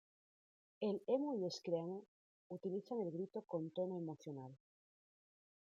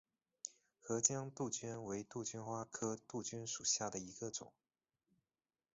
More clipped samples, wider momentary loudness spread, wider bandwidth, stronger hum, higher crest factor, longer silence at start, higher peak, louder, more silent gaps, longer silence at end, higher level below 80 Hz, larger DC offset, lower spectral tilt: neither; about the same, 13 LU vs 15 LU; about the same, 7.6 kHz vs 8 kHz; neither; second, 20 dB vs 26 dB; first, 0.8 s vs 0.45 s; second, -26 dBFS vs -18 dBFS; about the same, -44 LUFS vs -42 LUFS; first, 2.08-2.50 s vs none; second, 1.1 s vs 1.25 s; second, under -90 dBFS vs -78 dBFS; neither; first, -7 dB/octave vs -4.5 dB/octave